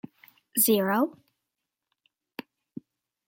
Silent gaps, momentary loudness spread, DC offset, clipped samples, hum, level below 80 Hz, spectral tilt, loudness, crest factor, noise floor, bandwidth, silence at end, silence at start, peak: none; 25 LU; under 0.1%; under 0.1%; none; -78 dBFS; -3.5 dB/octave; -24 LUFS; 22 dB; -85 dBFS; 17 kHz; 2.2 s; 0.55 s; -8 dBFS